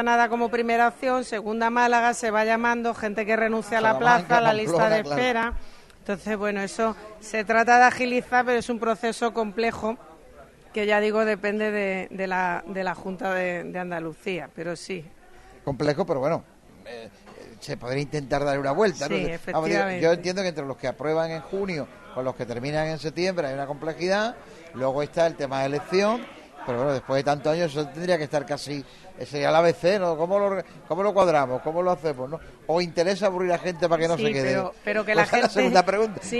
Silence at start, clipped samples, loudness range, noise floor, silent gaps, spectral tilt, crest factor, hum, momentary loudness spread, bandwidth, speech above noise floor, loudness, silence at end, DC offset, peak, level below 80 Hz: 0 s; under 0.1%; 7 LU; -49 dBFS; none; -5 dB/octave; 20 dB; none; 12 LU; 12.5 kHz; 25 dB; -24 LUFS; 0 s; under 0.1%; -4 dBFS; -52 dBFS